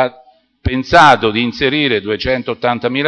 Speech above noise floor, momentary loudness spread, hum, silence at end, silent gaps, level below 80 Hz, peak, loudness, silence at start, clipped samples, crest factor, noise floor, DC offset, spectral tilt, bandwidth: 33 dB; 12 LU; none; 0 s; none; -36 dBFS; 0 dBFS; -13 LUFS; 0 s; 0.2%; 14 dB; -47 dBFS; under 0.1%; -5 dB/octave; 11 kHz